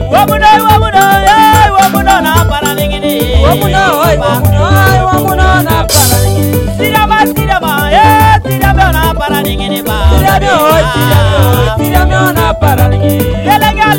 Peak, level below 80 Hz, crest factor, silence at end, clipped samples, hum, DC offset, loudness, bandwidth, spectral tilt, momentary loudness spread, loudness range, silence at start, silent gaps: 0 dBFS; -16 dBFS; 8 dB; 0 s; 2%; none; under 0.1%; -8 LUFS; 17 kHz; -5 dB/octave; 6 LU; 2 LU; 0 s; none